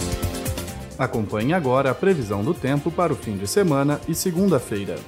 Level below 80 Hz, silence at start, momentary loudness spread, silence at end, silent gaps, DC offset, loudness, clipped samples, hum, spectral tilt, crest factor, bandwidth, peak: -40 dBFS; 0 s; 8 LU; 0 s; none; under 0.1%; -22 LUFS; under 0.1%; none; -5.5 dB/octave; 16 dB; 16 kHz; -6 dBFS